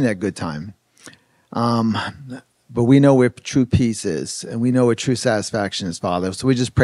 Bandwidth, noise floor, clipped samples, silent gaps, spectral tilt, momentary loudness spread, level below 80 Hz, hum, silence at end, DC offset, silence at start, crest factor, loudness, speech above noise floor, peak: 12 kHz; -46 dBFS; under 0.1%; none; -6 dB/octave; 15 LU; -44 dBFS; none; 0 s; under 0.1%; 0 s; 18 dB; -19 LUFS; 28 dB; 0 dBFS